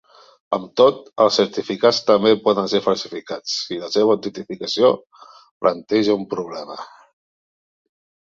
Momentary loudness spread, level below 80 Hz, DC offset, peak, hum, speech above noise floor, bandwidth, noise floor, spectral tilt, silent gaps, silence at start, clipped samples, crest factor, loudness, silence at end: 13 LU; -64 dBFS; under 0.1%; -2 dBFS; none; over 71 dB; 7.6 kHz; under -90 dBFS; -4.5 dB/octave; 5.51-5.61 s; 0.5 s; under 0.1%; 18 dB; -19 LUFS; 1.45 s